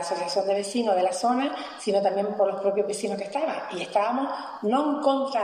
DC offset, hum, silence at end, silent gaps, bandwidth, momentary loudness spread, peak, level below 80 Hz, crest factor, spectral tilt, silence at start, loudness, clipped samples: under 0.1%; none; 0 s; none; 13 kHz; 6 LU; -10 dBFS; -74 dBFS; 14 dB; -4 dB/octave; 0 s; -26 LUFS; under 0.1%